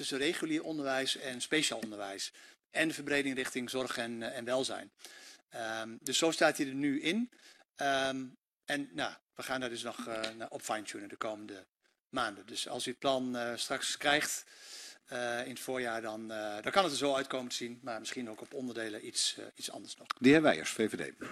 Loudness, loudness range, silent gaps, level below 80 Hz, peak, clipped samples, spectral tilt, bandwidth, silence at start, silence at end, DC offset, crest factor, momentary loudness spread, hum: -34 LUFS; 6 LU; 9.21-9.27 s, 11.69-11.73 s, 12.00-12.05 s; -72 dBFS; -10 dBFS; under 0.1%; -3 dB/octave; 14 kHz; 0 s; 0 s; under 0.1%; 24 dB; 13 LU; none